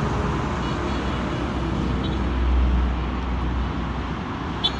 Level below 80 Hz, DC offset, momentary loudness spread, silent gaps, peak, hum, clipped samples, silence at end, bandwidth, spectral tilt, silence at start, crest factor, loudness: -26 dBFS; under 0.1%; 6 LU; none; -8 dBFS; none; under 0.1%; 0 s; 8 kHz; -6.5 dB/octave; 0 s; 16 dB; -25 LUFS